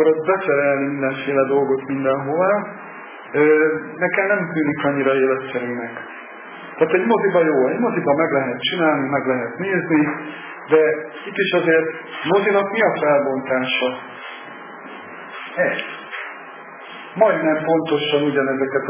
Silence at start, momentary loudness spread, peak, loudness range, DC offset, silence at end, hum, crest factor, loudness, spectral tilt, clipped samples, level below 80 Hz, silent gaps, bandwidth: 0 s; 18 LU; -2 dBFS; 4 LU; under 0.1%; 0 s; none; 18 dB; -19 LUFS; -9.5 dB/octave; under 0.1%; -68 dBFS; none; 3.6 kHz